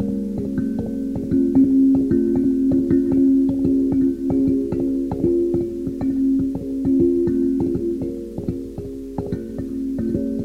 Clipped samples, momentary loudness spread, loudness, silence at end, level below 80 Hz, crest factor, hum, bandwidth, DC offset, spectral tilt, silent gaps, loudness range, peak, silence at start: under 0.1%; 11 LU; -20 LUFS; 0 s; -40 dBFS; 12 dB; none; 2.4 kHz; under 0.1%; -10 dB/octave; none; 5 LU; -6 dBFS; 0 s